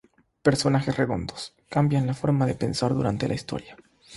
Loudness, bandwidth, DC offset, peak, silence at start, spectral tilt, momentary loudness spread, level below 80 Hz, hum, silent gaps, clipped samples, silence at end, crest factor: -25 LUFS; 11.5 kHz; under 0.1%; -6 dBFS; 0.45 s; -6.5 dB/octave; 11 LU; -50 dBFS; none; none; under 0.1%; 0 s; 20 dB